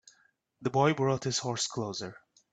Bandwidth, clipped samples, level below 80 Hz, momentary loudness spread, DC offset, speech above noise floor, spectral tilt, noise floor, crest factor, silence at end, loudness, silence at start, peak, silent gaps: 9.2 kHz; under 0.1%; -70 dBFS; 12 LU; under 0.1%; 39 dB; -4.5 dB/octave; -69 dBFS; 20 dB; 0.4 s; -30 LUFS; 0.6 s; -12 dBFS; none